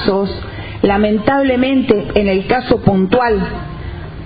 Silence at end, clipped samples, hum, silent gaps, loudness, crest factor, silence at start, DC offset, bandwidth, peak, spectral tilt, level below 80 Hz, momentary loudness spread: 0 s; under 0.1%; none; none; -14 LUFS; 14 dB; 0 s; under 0.1%; 5 kHz; 0 dBFS; -10 dB/octave; -32 dBFS; 13 LU